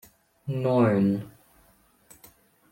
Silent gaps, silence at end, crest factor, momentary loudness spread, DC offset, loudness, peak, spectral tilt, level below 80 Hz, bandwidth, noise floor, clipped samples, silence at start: none; 1.45 s; 18 dB; 19 LU; under 0.1%; -25 LUFS; -10 dBFS; -8.5 dB/octave; -66 dBFS; 16.5 kHz; -61 dBFS; under 0.1%; 0.45 s